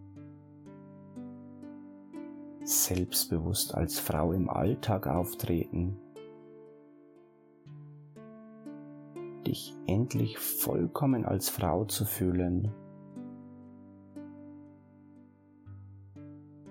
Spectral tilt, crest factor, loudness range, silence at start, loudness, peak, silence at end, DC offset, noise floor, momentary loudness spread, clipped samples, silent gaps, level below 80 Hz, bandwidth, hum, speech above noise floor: -5 dB/octave; 20 dB; 19 LU; 0 s; -31 LUFS; -14 dBFS; 0 s; under 0.1%; -59 dBFS; 22 LU; under 0.1%; none; -54 dBFS; 18 kHz; none; 29 dB